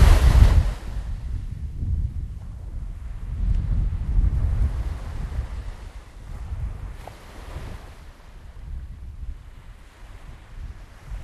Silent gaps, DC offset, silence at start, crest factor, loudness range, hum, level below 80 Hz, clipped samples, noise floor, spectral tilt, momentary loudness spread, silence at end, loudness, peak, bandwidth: none; under 0.1%; 0 s; 22 dB; 14 LU; none; -24 dBFS; under 0.1%; -43 dBFS; -6.5 dB/octave; 21 LU; 0 s; -26 LUFS; -2 dBFS; 12.5 kHz